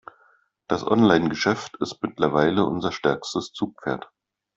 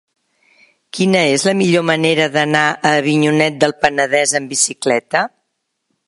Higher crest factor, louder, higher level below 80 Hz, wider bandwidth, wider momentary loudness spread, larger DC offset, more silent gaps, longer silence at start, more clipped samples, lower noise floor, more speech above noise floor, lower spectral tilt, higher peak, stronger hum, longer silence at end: first, 22 dB vs 16 dB; second, -23 LUFS vs -14 LUFS; about the same, -58 dBFS vs -58 dBFS; second, 7.8 kHz vs 11.5 kHz; first, 12 LU vs 5 LU; neither; neither; second, 0.7 s vs 0.95 s; neither; second, -61 dBFS vs -72 dBFS; second, 39 dB vs 57 dB; first, -5.5 dB/octave vs -3.5 dB/octave; about the same, -2 dBFS vs 0 dBFS; neither; second, 0.5 s vs 0.8 s